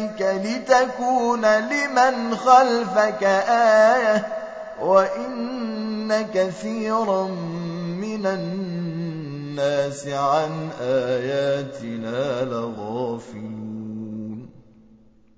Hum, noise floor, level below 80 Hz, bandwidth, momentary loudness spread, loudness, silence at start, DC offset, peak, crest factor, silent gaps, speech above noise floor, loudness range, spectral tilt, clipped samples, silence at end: none; -52 dBFS; -64 dBFS; 8 kHz; 15 LU; -21 LUFS; 0 s; under 0.1%; -2 dBFS; 20 dB; none; 32 dB; 9 LU; -5.5 dB/octave; under 0.1%; 0.75 s